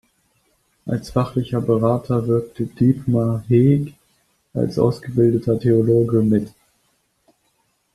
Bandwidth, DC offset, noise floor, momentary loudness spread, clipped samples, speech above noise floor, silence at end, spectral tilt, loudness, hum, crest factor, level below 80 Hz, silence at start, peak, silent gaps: 12.5 kHz; under 0.1%; -66 dBFS; 11 LU; under 0.1%; 48 dB; 1.45 s; -9.5 dB/octave; -19 LUFS; none; 16 dB; -50 dBFS; 0.85 s; -2 dBFS; none